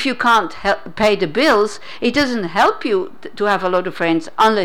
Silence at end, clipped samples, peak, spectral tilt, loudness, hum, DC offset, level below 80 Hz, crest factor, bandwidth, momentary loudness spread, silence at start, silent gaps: 0 s; under 0.1%; -6 dBFS; -4.5 dB/octave; -17 LUFS; none; 2%; -48 dBFS; 10 dB; 18 kHz; 7 LU; 0 s; none